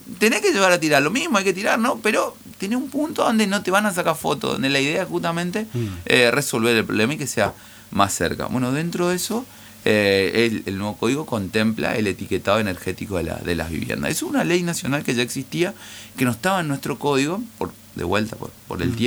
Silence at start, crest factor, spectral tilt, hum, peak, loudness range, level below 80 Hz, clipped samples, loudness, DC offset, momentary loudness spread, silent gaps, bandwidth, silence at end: 0 s; 22 dB; -4.5 dB/octave; none; 0 dBFS; 3 LU; -50 dBFS; under 0.1%; -21 LUFS; under 0.1%; 10 LU; none; over 20 kHz; 0 s